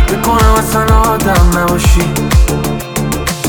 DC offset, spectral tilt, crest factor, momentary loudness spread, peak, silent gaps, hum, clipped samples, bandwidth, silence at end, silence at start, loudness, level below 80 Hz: 0.5%; -5 dB/octave; 10 dB; 7 LU; 0 dBFS; none; none; under 0.1%; over 20 kHz; 0 s; 0 s; -11 LUFS; -14 dBFS